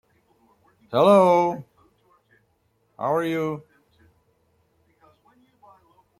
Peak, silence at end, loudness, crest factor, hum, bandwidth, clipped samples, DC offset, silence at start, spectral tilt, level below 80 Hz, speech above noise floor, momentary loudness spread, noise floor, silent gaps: -4 dBFS; 2.6 s; -21 LUFS; 22 dB; none; 16 kHz; under 0.1%; under 0.1%; 0.9 s; -7 dB/octave; -70 dBFS; 48 dB; 16 LU; -68 dBFS; none